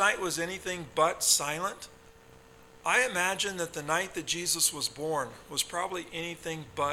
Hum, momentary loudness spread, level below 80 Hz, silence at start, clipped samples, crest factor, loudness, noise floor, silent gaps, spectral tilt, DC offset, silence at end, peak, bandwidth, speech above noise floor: none; 11 LU; -62 dBFS; 0 s; under 0.1%; 20 dB; -29 LUFS; -55 dBFS; none; -1.5 dB/octave; under 0.1%; 0 s; -10 dBFS; 17.5 kHz; 24 dB